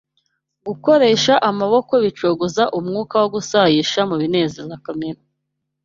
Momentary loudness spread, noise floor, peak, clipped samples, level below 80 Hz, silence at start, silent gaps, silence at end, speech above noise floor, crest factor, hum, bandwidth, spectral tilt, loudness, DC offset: 15 LU; -76 dBFS; -2 dBFS; under 0.1%; -58 dBFS; 0.65 s; none; 0.7 s; 59 dB; 16 dB; none; 7.6 kHz; -4.5 dB/octave; -17 LUFS; under 0.1%